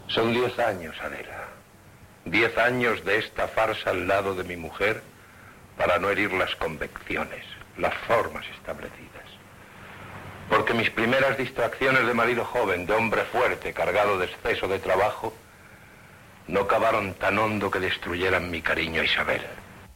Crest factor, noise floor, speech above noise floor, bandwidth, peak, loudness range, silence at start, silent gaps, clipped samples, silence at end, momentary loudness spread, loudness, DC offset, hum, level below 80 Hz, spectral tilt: 18 dB; -51 dBFS; 25 dB; 16.5 kHz; -8 dBFS; 5 LU; 0 s; none; under 0.1%; 0.05 s; 17 LU; -25 LUFS; under 0.1%; none; -52 dBFS; -5 dB/octave